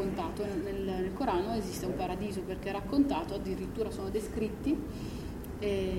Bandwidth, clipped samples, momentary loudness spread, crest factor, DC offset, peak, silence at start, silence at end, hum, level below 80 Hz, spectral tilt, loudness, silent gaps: 16.5 kHz; under 0.1%; 6 LU; 18 dB; under 0.1%; -16 dBFS; 0 s; 0 s; none; -46 dBFS; -6.5 dB/octave; -34 LUFS; none